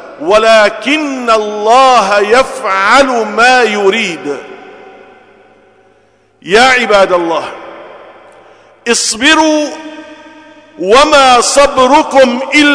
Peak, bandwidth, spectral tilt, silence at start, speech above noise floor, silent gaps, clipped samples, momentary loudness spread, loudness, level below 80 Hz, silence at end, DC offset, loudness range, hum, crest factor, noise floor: 0 dBFS; 11 kHz; -2 dB/octave; 0 s; 41 dB; none; 0.4%; 14 LU; -8 LUFS; -42 dBFS; 0 s; under 0.1%; 5 LU; none; 10 dB; -49 dBFS